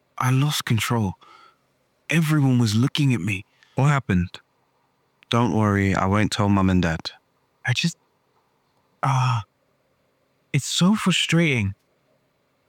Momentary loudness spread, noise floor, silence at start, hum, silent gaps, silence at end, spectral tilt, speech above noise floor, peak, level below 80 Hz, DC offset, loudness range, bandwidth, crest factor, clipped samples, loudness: 10 LU; -67 dBFS; 0.15 s; none; none; 0.95 s; -5.5 dB/octave; 47 dB; -6 dBFS; -52 dBFS; under 0.1%; 5 LU; 17.5 kHz; 18 dB; under 0.1%; -22 LUFS